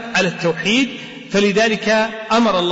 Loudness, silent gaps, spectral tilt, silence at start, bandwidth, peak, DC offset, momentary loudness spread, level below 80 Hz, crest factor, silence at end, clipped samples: -17 LUFS; none; -4 dB/octave; 0 s; 8 kHz; -6 dBFS; under 0.1%; 6 LU; -52 dBFS; 12 dB; 0 s; under 0.1%